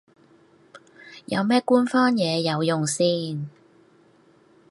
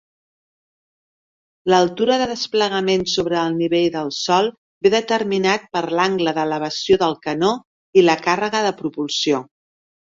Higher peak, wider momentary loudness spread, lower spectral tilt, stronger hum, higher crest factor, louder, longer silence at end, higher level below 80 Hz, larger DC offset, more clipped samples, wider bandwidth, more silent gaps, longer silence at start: second, -6 dBFS vs -2 dBFS; first, 16 LU vs 6 LU; about the same, -5 dB/octave vs -4.5 dB/octave; neither; about the same, 18 dB vs 18 dB; second, -22 LUFS vs -19 LUFS; first, 1.2 s vs 0.75 s; second, -72 dBFS vs -58 dBFS; neither; neither; first, 11.5 kHz vs 7.6 kHz; second, none vs 4.58-4.81 s, 7.65-7.93 s; second, 0.75 s vs 1.65 s